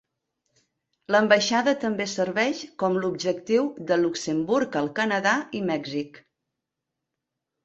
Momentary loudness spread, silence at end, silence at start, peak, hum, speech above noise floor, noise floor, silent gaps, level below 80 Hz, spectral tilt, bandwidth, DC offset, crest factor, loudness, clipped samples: 8 LU; 1.45 s; 1.1 s; -6 dBFS; none; 60 dB; -84 dBFS; none; -68 dBFS; -4 dB/octave; 8.2 kHz; under 0.1%; 20 dB; -24 LUFS; under 0.1%